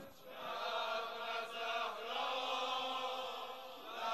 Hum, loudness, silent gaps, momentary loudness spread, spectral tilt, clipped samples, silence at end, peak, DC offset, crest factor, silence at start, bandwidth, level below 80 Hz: none; -41 LUFS; none; 10 LU; -1 dB/octave; under 0.1%; 0 s; -26 dBFS; under 0.1%; 16 dB; 0 s; 13.5 kHz; -86 dBFS